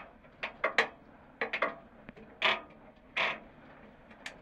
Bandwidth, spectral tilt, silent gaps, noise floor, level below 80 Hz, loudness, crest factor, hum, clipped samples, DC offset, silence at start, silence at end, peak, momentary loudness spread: 16 kHz; -2.5 dB/octave; none; -56 dBFS; -66 dBFS; -33 LUFS; 28 dB; none; under 0.1%; under 0.1%; 0 s; 0 s; -10 dBFS; 24 LU